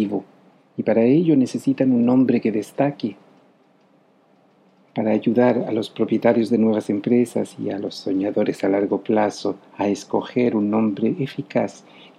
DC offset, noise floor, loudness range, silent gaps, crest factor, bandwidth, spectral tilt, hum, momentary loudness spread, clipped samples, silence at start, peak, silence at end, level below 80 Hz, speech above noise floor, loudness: under 0.1%; -57 dBFS; 4 LU; none; 18 dB; 12 kHz; -7 dB/octave; none; 10 LU; under 0.1%; 0 s; -4 dBFS; 0.4 s; -74 dBFS; 37 dB; -21 LUFS